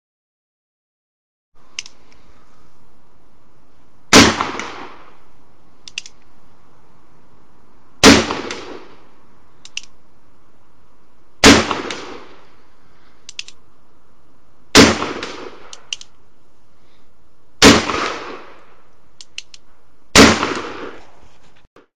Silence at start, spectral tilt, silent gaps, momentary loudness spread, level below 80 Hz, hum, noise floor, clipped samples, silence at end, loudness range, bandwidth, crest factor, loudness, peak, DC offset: 1.5 s; -3 dB/octave; 21.67-21.76 s; 25 LU; -40 dBFS; none; -57 dBFS; 0.1%; 0.05 s; 1 LU; 16 kHz; 20 dB; -12 LUFS; 0 dBFS; 3%